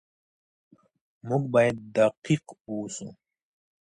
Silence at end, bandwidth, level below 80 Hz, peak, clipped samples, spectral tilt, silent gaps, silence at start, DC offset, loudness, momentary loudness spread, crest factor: 0.7 s; 11 kHz; -66 dBFS; -10 dBFS; under 0.1%; -6 dB/octave; 2.17-2.22 s, 2.61-2.65 s; 1.25 s; under 0.1%; -26 LUFS; 16 LU; 20 dB